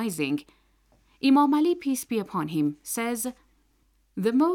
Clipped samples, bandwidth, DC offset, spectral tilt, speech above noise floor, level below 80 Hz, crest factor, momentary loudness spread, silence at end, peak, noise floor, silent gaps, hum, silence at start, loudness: under 0.1%; 17.5 kHz; under 0.1%; -5 dB/octave; 41 dB; -66 dBFS; 16 dB; 11 LU; 0 s; -10 dBFS; -66 dBFS; none; none; 0 s; -26 LUFS